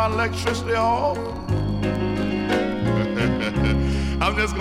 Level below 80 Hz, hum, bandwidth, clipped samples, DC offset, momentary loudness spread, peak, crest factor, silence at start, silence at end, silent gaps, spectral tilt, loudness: -32 dBFS; none; 14.5 kHz; under 0.1%; under 0.1%; 4 LU; -6 dBFS; 16 dB; 0 s; 0 s; none; -6 dB/octave; -23 LUFS